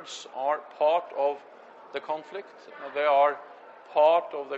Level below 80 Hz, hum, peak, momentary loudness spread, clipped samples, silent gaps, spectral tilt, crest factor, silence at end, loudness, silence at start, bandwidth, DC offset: -84 dBFS; none; -10 dBFS; 19 LU; under 0.1%; none; -2.5 dB/octave; 18 dB; 0 s; -26 LUFS; 0 s; 8.2 kHz; under 0.1%